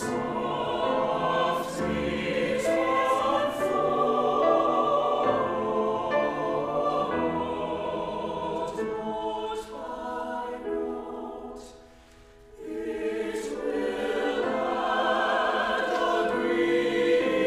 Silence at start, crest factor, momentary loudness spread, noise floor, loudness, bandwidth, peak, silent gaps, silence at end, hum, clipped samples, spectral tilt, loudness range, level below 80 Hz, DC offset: 0 s; 16 dB; 10 LU; -52 dBFS; -27 LUFS; 15 kHz; -12 dBFS; none; 0 s; none; under 0.1%; -5 dB/octave; 10 LU; -56 dBFS; under 0.1%